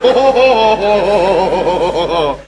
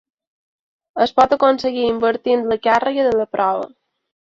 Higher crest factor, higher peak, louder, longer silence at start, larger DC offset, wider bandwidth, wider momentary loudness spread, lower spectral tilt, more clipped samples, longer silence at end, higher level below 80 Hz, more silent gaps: second, 12 dB vs 18 dB; about the same, 0 dBFS vs -2 dBFS; first, -11 LUFS vs -17 LUFS; second, 0 s vs 0.95 s; neither; first, 11 kHz vs 7.6 kHz; about the same, 5 LU vs 6 LU; about the same, -5 dB/octave vs -5 dB/octave; neither; second, 0.05 s vs 0.65 s; first, -36 dBFS vs -56 dBFS; neither